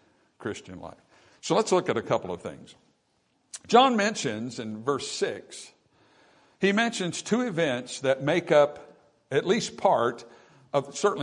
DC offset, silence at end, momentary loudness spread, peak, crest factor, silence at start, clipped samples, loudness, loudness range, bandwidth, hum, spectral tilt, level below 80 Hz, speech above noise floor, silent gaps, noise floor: under 0.1%; 0 s; 19 LU; -6 dBFS; 22 dB; 0.4 s; under 0.1%; -26 LUFS; 4 LU; 11 kHz; none; -4 dB/octave; -72 dBFS; 45 dB; none; -71 dBFS